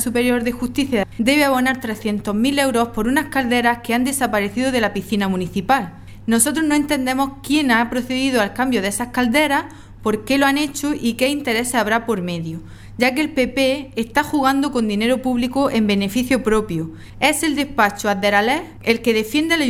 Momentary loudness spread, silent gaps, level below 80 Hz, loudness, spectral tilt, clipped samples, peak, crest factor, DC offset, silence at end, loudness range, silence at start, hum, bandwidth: 7 LU; none; -44 dBFS; -18 LUFS; -4 dB/octave; under 0.1%; 0 dBFS; 18 dB; under 0.1%; 0 s; 1 LU; 0 s; none; 16.5 kHz